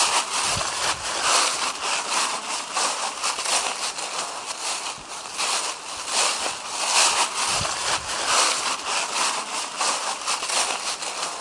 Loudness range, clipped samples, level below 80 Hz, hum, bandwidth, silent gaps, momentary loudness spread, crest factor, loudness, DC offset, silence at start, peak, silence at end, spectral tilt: 4 LU; under 0.1%; -58 dBFS; none; 12 kHz; none; 9 LU; 20 dB; -23 LUFS; under 0.1%; 0 s; -6 dBFS; 0 s; 0.5 dB/octave